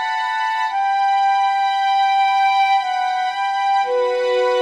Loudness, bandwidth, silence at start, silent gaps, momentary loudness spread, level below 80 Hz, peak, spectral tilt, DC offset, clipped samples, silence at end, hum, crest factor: -18 LUFS; 10.5 kHz; 0 s; none; 5 LU; -72 dBFS; -8 dBFS; -0.5 dB/octave; under 0.1%; under 0.1%; 0 s; none; 10 dB